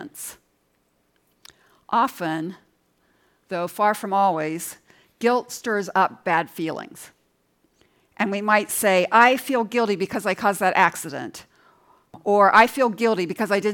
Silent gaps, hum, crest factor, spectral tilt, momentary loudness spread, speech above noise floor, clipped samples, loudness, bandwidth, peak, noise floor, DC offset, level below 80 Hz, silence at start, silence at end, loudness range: none; none; 20 dB; -4 dB/octave; 17 LU; 46 dB; under 0.1%; -21 LUFS; 18 kHz; -2 dBFS; -67 dBFS; under 0.1%; -70 dBFS; 0 s; 0 s; 7 LU